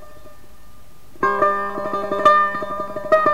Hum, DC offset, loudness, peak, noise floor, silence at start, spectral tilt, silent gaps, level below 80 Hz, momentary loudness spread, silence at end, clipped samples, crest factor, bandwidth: none; 2%; -19 LUFS; -2 dBFS; -48 dBFS; 0 s; -5 dB/octave; none; -50 dBFS; 11 LU; 0 s; under 0.1%; 18 dB; 16 kHz